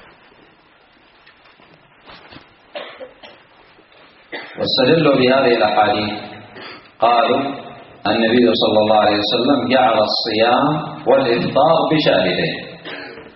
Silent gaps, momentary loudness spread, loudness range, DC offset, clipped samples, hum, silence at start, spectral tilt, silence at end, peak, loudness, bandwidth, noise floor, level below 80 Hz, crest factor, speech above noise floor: none; 20 LU; 5 LU; under 0.1%; under 0.1%; none; 2.1 s; -3 dB/octave; 0.05 s; -2 dBFS; -15 LUFS; 5.8 kHz; -51 dBFS; -56 dBFS; 16 dB; 36 dB